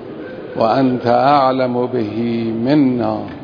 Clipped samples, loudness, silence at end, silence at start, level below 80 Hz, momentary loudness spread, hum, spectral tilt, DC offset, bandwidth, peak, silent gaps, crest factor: under 0.1%; -16 LUFS; 0 s; 0 s; -54 dBFS; 8 LU; none; -9 dB/octave; under 0.1%; 5.4 kHz; 0 dBFS; none; 16 dB